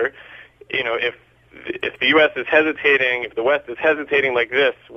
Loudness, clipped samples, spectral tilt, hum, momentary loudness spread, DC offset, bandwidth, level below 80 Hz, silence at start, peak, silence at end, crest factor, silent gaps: -18 LUFS; under 0.1%; -5 dB/octave; none; 10 LU; under 0.1%; 6.6 kHz; -58 dBFS; 0 s; -2 dBFS; 0 s; 18 dB; none